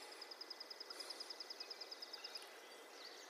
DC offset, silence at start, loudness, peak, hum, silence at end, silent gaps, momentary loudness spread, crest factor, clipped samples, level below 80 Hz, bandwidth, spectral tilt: under 0.1%; 0 s; -51 LUFS; -38 dBFS; none; 0 s; none; 6 LU; 16 dB; under 0.1%; under -90 dBFS; 15.5 kHz; 1.5 dB/octave